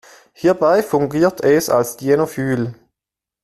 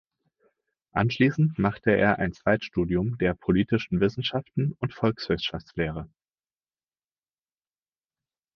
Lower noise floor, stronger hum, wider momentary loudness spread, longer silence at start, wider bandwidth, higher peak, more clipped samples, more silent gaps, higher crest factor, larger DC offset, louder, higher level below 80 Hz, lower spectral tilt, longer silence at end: about the same, -87 dBFS vs under -90 dBFS; neither; about the same, 6 LU vs 8 LU; second, 0.4 s vs 0.95 s; first, 14 kHz vs 6.8 kHz; first, -2 dBFS vs -6 dBFS; neither; neither; second, 14 dB vs 22 dB; neither; first, -17 LUFS vs -26 LUFS; about the same, -54 dBFS vs -50 dBFS; second, -6 dB/octave vs -8 dB/octave; second, 0.7 s vs 2.5 s